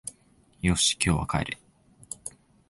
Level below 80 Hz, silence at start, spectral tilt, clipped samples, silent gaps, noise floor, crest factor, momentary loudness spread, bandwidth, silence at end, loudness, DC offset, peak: -42 dBFS; 0.05 s; -3.5 dB/octave; under 0.1%; none; -61 dBFS; 24 dB; 19 LU; 12 kHz; 0.4 s; -25 LUFS; under 0.1%; -6 dBFS